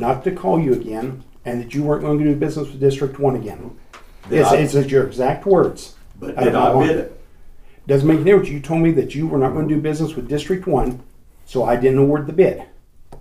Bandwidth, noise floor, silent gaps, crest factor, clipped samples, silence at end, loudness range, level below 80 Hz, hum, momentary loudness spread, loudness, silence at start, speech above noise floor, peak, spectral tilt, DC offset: 15 kHz; -39 dBFS; none; 16 dB; under 0.1%; 0 s; 3 LU; -38 dBFS; none; 14 LU; -18 LUFS; 0 s; 22 dB; -2 dBFS; -7.5 dB/octave; under 0.1%